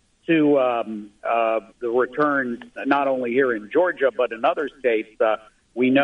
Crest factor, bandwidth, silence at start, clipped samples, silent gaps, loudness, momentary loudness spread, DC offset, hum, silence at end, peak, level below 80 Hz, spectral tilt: 16 dB; 8.6 kHz; 0.3 s; under 0.1%; none; -22 LUFS; 8 LU; under 0.1%; none; 0 s; -4 dBFS; -64 dBFS; -7 dB/octave